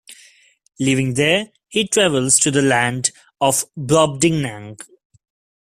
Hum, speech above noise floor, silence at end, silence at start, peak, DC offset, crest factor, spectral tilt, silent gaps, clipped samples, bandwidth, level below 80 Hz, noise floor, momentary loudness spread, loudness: none; 35 dB; 0.85 s; 0.1 s; 0 dBFS; under 0.1%; 20 dB; -3.5 dB/octave; none; under 0.1%; 15 kHz; -54 dBFS; -52 dBFS; 10 LU; -17 LUFS